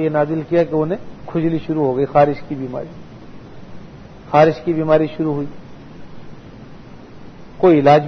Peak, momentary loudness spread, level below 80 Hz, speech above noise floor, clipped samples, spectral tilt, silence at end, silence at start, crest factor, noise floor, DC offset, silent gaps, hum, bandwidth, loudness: 0 dBFS; 25 LU; -48 dBFS; 21 dB; under 0.1%; -8.5 dB/octave; 0 s; 0 s; 18 dB; -37 dBFS; under 0.1%; none; none; 6.4 kHz; -17 LUFS